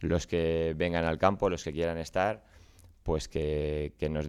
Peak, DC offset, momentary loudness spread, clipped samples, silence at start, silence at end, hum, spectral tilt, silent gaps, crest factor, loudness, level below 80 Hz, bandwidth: -8 dBFS; under 0.1%; 7 LU; under 0.1%; 0 s; 0 s; none; -6 dB/octave; none; 22 dB; -31 LUFS; -46 dBFS; 13 kHz